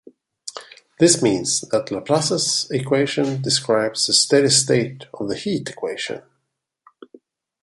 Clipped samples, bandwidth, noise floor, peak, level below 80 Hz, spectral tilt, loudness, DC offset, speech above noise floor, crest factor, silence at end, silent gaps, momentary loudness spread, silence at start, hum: under 0.1%; 11.5 kHz; -76 dBFS; -2 dBFS; -60 dBFS; -3 dB/octave; -19 LUFS; under 0.1%; 57 dB; 20 dB; 1.45 s; none; 16 LU; 0.45 s; none